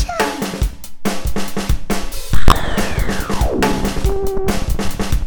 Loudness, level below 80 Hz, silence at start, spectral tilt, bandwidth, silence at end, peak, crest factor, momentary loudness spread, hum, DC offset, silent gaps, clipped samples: -20 LUFS; -22 dBFS; 0 s; -5 dB/octave; 19.5 kHz; 0 s; 0 dBFS; 14 dB; 7 LU; none; under 0.1%; none; under 0.1%